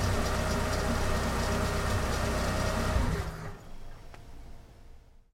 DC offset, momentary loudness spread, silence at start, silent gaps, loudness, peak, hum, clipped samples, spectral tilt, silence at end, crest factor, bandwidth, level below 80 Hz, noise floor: under 0.1%; 21 LU; 0 s; none; -31 LUFS; -14 dBFS; none; under 0.1%; -5 dB/octave; 0.35 s; 16 dB; 16.5 kHz; -36 dBFS; -52 dBFS